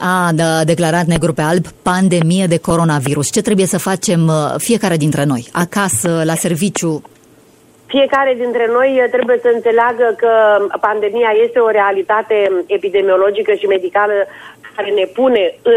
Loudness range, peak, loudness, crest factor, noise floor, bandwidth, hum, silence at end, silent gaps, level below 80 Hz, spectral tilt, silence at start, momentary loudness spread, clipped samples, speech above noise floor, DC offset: 3 LU; -2 dBFS; -14 LUFS; 12 dB; -46 dBFS; 16 kHz; none; 0 s; none; -46 dBFS; -5 dB/octave; 0 s; 4 LU; under 0.1%; 33 dB; under 0.1%